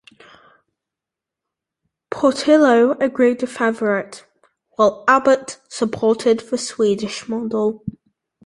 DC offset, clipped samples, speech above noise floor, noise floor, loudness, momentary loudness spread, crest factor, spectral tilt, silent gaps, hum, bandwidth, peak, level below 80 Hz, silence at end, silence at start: under 0.1%; under 0.1%; 69 dB; -86 dBFS; -18 LUFS; 13 LU; 18 dB; -4.5 dB/octave; none; none; 11.5 kHz; -2 dBFS; -60 dBFS; 0.55 s; 2.1 s